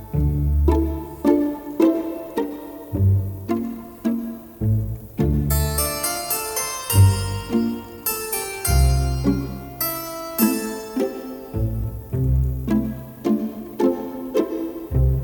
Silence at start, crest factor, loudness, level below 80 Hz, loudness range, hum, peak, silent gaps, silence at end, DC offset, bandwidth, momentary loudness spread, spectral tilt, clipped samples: 0 s; 18 dB; -22 LUFS; -28 dBFS; 3 LU; none; -4 dBFS; none; 0 s; under 0.1%; over 20 kHz; 9 LU; -6 dB/octave; under 0.1%